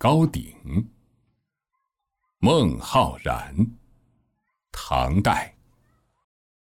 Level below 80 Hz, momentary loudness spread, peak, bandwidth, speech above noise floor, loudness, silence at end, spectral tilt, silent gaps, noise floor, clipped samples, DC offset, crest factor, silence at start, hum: -40 dBFS; 16 LU; -6 dBFS; 17 kHz; 58 dB; -23 LUFS; 1.25 s; -6.5 dB/octave; none; -79 dBFS; under 0.1%; under 0.1%; 20 dB; 0 s; none